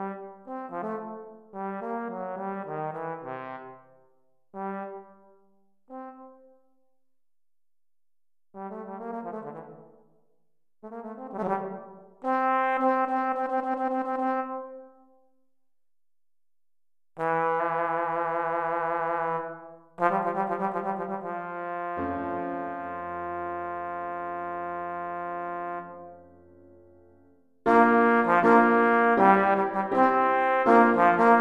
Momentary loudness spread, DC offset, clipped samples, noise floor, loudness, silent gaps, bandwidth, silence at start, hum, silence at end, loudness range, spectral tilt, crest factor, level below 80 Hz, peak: 22 LU; under 0.1%; under 0.1%; under -90 dBFS; -26 LUFS; none; 9.4 kHz; 0 s; none; 0 s; 20 LU; -8 dB/octave; 22 dB; -66 dBFS; -6 dBFS